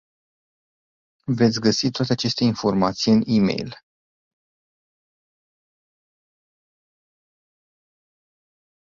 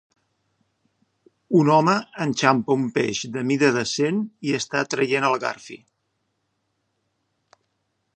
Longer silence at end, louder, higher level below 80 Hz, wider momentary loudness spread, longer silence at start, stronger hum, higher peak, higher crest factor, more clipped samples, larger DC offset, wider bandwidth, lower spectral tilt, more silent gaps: first, 5.25 s vs 2.4 s; about the same, -20 LUFS vs -21 LUFS; first, -58 dBFS vs -70 dBFS; about the same, 10 LU vs 9 LU; second, 1.3 s vs 1.5 s; neither; second, -4 dBFS vs 0 dBFS; about the same, 20 dB vs 22 dB; neither; neither; second, 7.4 kHz vs 9.4 kHz; about the same, -5.5 dB/octave vs -5 dB/octave; neither